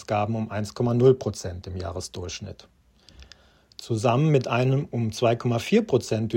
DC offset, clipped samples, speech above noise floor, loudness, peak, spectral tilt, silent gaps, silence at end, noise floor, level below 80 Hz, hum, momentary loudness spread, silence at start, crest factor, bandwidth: under 0.1%; under 0.1%; 31 dB; -24 LUFS; -6 dBFS; -6.5 dB/octave; none; 0 s; -54 dBFS; -54 dBFS; none; 14 LU; 0 s; 18 dB; 16 kHz